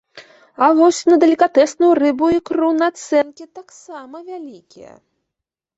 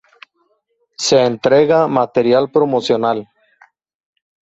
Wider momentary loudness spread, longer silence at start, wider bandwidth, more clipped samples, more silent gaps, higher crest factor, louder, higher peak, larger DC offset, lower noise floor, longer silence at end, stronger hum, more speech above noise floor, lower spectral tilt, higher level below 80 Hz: first, 21 LU vs 7 LU; second, 0.15 s vs 1 s; about the same, 8 kHz vs 8.2 kHz; neither; neither; about the same, 16 dB vs 16 dB; about the same, -15 LUFS vs -14 LUFS; about the same, -2 dBFS vs 0 dBFS; neither; first, -83 dBFS vs -64 dBFS; second, 0.95 s vs 1.2 s; neither; first, 67 dB vs 51 dB; about the same, -4 dB/octave vs -4.5 dB/octave; about the same, -60 dBFS vs -58 dBFS